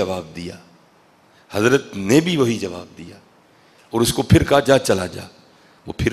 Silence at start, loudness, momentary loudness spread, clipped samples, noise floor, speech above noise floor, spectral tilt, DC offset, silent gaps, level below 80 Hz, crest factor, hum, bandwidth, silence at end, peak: 0 s; -18 LUFS; 20 LU; under 0.1%; -54 dBFS; 35 dB; -5.5 dB/octave; under 0.1%; none; -42 dBFS; 20 dB; none; 15.5 kHz; 0 s; 0 dBFS